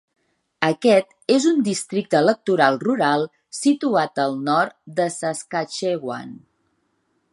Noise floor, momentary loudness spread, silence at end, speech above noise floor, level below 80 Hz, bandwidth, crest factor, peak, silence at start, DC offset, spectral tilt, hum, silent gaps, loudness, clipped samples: -69 dBFS; 9 LU; 0.95 s; 49 dB; -72 dBFS; 11.5 kHz; 20 dB; 0 dBFS; 0.6 s; under 0.1%; -4.5 dB/octave; none; none; -21 LUFS; under 0.1%